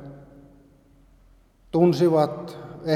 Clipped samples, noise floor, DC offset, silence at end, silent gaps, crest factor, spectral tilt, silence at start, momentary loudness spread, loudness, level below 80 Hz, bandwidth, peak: under 0.1%; -56 dBFS; under 0.1%; 0 s; none; 20 dB; -8 dB/octave; 0 s; 19 LU; -21 LUFS; -58 dBFS; 14 kHz; -6 dBFS